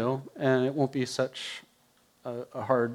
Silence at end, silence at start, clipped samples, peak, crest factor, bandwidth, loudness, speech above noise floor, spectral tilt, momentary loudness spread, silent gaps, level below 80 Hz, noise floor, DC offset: 0 s; 0 s; under 0.1%; -10 dBFS; 20 dB; 15 kHz; -30 LUFS; 36 dB; -6 dB/octave; 13 LU; none; -78 dBFS; -65 dBFS; under 0.1%